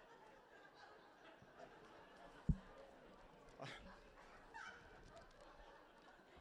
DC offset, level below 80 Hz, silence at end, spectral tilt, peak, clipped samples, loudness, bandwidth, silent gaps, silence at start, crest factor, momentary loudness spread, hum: under 0.1%; -60 dBFS; 0 s; -6.5 dB/octave; -26 dBFS; under 0.1%; -56 LUFS; 11 kHz; none; 0 s; 30 dB; 16 LU; none